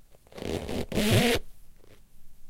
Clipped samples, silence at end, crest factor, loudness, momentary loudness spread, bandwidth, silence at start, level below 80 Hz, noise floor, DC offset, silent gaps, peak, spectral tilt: under 0.1%; 0 s; 20 dB; -27 LUFS; 12 LU; 17 kHz; 0.1 s; -44 dBFS; -48 dBFS; under 0.1%; none; -10 dBFS; -4.5 dB/octave